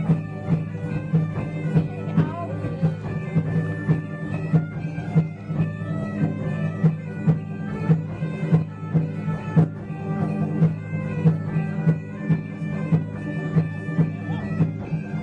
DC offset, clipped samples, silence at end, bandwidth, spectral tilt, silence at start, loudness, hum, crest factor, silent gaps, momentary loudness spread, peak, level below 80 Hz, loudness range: under 0.1%; under 0.1%; 0 s; 4.5 kHz; -10 dB/octave; 0 s; -25 LUFS; none; 16 dB; none; 7 LU; -8 dBFS; -52 dBFS; 2 LU